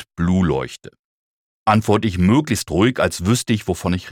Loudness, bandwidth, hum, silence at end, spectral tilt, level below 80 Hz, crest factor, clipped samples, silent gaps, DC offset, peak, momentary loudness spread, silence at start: -18 LUFS; 17 kHz; none; 0 s; -6 dB/octave; -44 dBFS; 16 dB; under 0.1%; 0.99-1.66 s; under 0.1%; -2 dBFS; 8 LU; 0 s